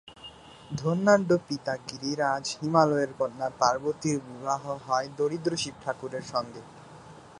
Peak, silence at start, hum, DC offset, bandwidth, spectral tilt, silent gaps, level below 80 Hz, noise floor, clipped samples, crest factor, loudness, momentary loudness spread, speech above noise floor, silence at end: -6 dBFS; 0.05 s; none; under 0.1%; 11.5 kHz; -5 dB/octave; none; -64 dBFS; -48 dBFS; under 0.1%; 22 dB; -28 LUFS; 23 LU; 21 dB; 0 s